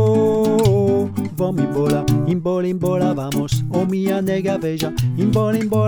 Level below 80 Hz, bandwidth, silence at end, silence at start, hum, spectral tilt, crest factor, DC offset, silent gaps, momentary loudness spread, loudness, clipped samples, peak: -42 dBFS; over 20 kHz; 0 s; 0 s; none; -7.5 dB/octave; 14 dB; under 0.1%; none; 6 LU; -19 LUFS; under 0.1%; -4 dBFS